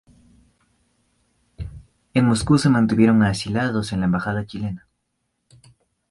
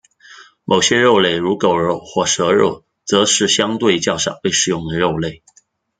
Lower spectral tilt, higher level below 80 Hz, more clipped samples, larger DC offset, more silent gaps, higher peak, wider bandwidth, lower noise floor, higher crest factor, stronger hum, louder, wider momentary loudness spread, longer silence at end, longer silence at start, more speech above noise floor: first, -6.5 dB/octave vs -3 dB/octave; first, -44 dBFS vs -50 dBFS; neither; neither; neither; second, -4 dBFS vs 0 dBFS; first, 11.5 kHz vs 10 kHz; first, -74 dBFS vs -43 dBFS; about the same, 18 dB vs 16 dB; neither; second, -20 LUFS vs -15 LUFS; first, 21 LU vs 7 LU; first, 1.3 s vs 0.65 s; first, 1.6 s vs 0.3 s; first, 55 dB vs 28 dB